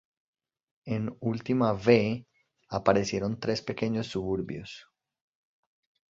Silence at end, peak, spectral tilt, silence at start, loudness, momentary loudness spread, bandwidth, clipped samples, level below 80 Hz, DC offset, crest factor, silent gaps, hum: 1.3 s; -6 dBFS; -6.5 dB/octave; 0.85 s; -29 LUFS; 15 LU; 7.8 kHz; under 0.1%; -58 dBFS; under 0.1%; 24 dB; none; none